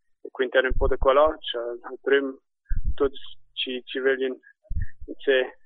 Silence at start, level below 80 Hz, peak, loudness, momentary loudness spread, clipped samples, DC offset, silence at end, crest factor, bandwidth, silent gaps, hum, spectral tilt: 0.25 s; -34 dBFS; -6 dBFS; -25 LUFS; 17 LU; under 0.1%; under 0.1%; 0.15 s; 18 dB; 4.1 kHz; none; none; -9 dB/octave